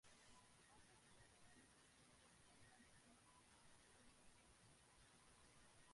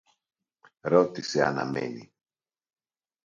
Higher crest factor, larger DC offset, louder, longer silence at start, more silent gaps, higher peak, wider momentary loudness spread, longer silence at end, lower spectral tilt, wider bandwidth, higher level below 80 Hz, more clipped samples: second, 16 dB vs 24 dB; neither; second, -70 LUFS vs -27 LUFS; second, 0.05 s vs 0.85 s; neither; second, -56 dBFS vs -6 dBFS; second, 1 LU vs 14 LU; second, 0 s vs 1.2 s; second, -2.5 dB/octave vs -5.5 dB/octave; first, 11.5 kHz vs 7.6 kHz; second, -84 dBFS vs -70 dBFS; neither